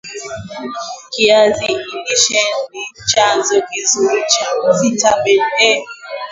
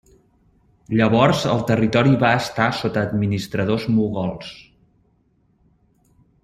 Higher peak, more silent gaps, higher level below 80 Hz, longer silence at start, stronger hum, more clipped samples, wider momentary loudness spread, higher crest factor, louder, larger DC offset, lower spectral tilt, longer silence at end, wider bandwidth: about the same, 0 dBFS vs -2 dBFS; neither; about the same, -52 dBFS vs -50 dBFS; second, 0.05 s vs 0.9 s; neither; neither; first, 15 LU vs 9 LU; about the same, 16 dB vs 18 dB; first, -13 LUFS vs -19 LUFS; neither; second, -1.5 dB/octave vs -6.5 dB/octave; second, 0 s vs 1.85 s; second, 7.8 kHz vs 15 kHz